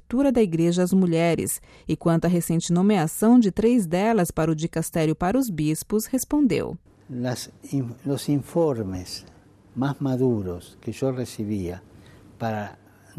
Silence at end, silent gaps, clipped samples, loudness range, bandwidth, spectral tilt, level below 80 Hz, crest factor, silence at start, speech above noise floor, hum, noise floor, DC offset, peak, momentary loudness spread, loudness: 0.45 s; none; under 0.1%; 7 LU; 15 kHz; -6.5 dB/octave; -50 dBFS; 16 dB; 0.1 s; 26 dB; none; -49 dBFS; under 0.1%; -8 dBFS; 13 LU; -23 LUFS